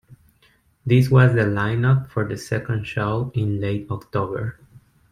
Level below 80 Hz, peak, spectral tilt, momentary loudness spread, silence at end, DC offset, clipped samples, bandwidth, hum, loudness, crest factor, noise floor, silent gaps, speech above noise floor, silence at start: -50 dBFS; -2 dBFS; -8 dB/octave; 12 LU; 0.6 s; under 0.1%; under 0.1%; 10.5 kHz; none; -21 LUFS; 18 dB; -59 dBFS; none; 40 dB; 0.1 s